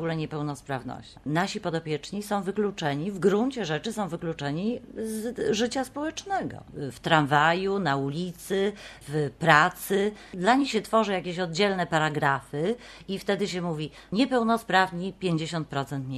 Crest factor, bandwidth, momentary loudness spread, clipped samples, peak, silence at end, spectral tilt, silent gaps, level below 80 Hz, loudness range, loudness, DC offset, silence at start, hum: 24 dB; 13 kHz; 11 LU; under 0.1%; -2 dBFS; 0 s; -5 dB/octave; none; -58 dBFS; 5 LU; -27 LUFS; under 0.1%; 0 s; none